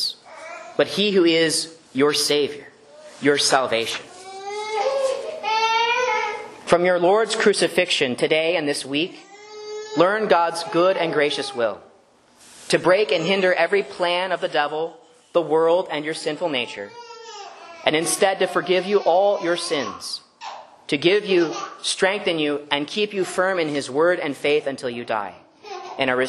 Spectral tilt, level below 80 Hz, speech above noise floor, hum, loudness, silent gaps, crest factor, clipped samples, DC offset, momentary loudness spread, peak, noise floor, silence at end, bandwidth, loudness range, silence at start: -3 dB/octave; -68 dBFS; 34 dB; none; -21 LUFS; none; 22 dB; under 0.1%; under 0.1%; 16 LU; 0 dBFS; -55 dBFS; 0 s; 12.5 kHz; 3 LU; 0 s